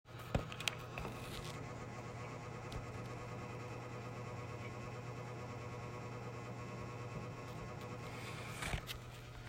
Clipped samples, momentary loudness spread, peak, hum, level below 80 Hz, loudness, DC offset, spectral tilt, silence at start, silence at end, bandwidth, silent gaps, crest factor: under 0.1%; 5 LU; -16 dBFS; none; -58 dBFS; -46 LUFS; under 0.1%; -5 dB/octave; 0.05 s; 0 s; 16 kHz; none; 30 dB